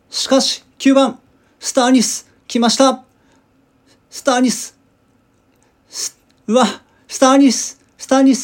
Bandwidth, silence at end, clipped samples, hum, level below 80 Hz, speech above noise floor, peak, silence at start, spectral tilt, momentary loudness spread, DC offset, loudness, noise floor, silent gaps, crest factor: 17 kHz; 0 s; under 0.1%; none; -66 dBFS; 43 dB; 0 dBFS; 0.1 s; -3 dB/octave; 16 LU; under 0.1%; -15 LUFS; -57 dBFS; none; 16 dB